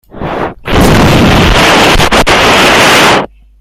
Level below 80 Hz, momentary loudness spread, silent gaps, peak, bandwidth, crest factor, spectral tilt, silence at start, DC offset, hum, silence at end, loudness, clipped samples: -18 dBFS; 12 LU; none; 0 dBFS; 19.5 kHz; 6 dB; -4 dB/octave; 0.15 s; under 0.1%; none; 0.35 s; -5 LUFS; 0.7%